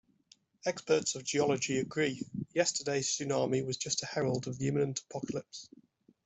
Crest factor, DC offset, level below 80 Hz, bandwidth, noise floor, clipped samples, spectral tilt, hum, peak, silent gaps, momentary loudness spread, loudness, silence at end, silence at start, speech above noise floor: 20 dB; under 0.1%; -70 dBFS; 8.2 kHz; -66 dBFS; under 0.1%; -4 dB/octave; none; -14 dBFS; none; 8 LU; -33 LUFS; 0.6 s; 0.65 s; 33 dB